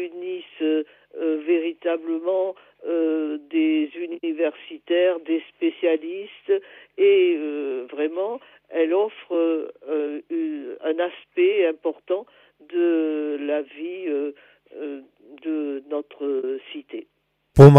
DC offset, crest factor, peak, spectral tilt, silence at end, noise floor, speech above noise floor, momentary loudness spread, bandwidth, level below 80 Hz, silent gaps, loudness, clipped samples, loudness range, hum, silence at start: under 0.1%; 22 dB; 0 dBFS; -8.5 dB/octave; 0 s; -69 dBFS; 46 dB; 12 LU; 8.6 kHz; -50 dBFS; none; -24 LUFS; under 0.1%; 6 LU; none; 0 s